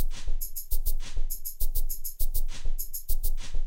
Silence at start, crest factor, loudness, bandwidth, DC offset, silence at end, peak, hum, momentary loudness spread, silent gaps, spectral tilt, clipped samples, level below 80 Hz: 0 s; 12 dB; -35 LUFS; 16.5 kHz; under 0.1%; 0 s; -12 dBFS; none; 3 LU; none; -2.5 dB/octave; under 0.1%; -26 dBFS